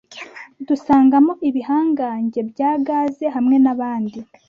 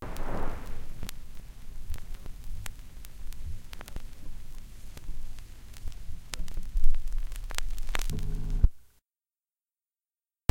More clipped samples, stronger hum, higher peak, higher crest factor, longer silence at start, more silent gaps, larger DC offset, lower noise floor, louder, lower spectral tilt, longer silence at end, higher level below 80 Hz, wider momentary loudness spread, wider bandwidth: neither; neither; about the same, -4 dBFS vs -6 dBFS; second, 14 dB vs 22 dB; about the same, 0.1 s vs 0 s; neither; neither; second, -37 dBFS vs under -90 dBFS; first, -18 LUFS vs -39 LUFS; first, -7.5 dB/octave vs -4.5 dB/octave; second, 0.25 s vs 1.7 s; second, -58 dBFS vs -32 dBFS; about the same, 15 LU vs 15 LU; second, 7 kHz vs 11.5 kHz